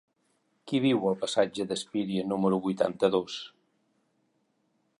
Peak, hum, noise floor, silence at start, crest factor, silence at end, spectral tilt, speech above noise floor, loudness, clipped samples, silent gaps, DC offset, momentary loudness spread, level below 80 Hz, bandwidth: -10 dBFS; none; -73 dBFS; 0.65 s; 20 dB; 1.5 s; -5.5 dB/octave; 46 dB; -28 LUFS; under 0.1%; none; under 0.1%; 7 LU; -70 dBFS; 11.5 kHz